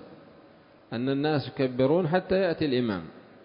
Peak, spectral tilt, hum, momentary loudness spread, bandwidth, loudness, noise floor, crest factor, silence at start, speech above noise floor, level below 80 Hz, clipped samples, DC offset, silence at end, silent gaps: -12 dBFS; -11 dB/octave; none; 10 LU; 5.4 kHz; -27 LUFS; -55 dBFS; 16 dB; 0 s; 29 dB; -58 dBFS; under 0.1%; under 0.1%; 0.25 s; none